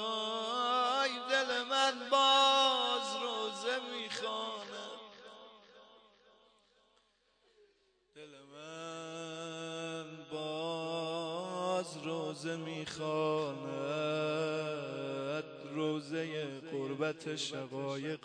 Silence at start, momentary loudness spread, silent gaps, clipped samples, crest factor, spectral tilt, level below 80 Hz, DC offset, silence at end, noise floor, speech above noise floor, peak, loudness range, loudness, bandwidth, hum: 0 s; 15 LU; none; under 0.1%; 20 dB; -3.5 dB/octave; -84 dBFS; under 0.1%; 0.05 s; -73 dBFS; 39 dB; -16 dBFS; 17 LU; -35 LUFS; 10 kHz; none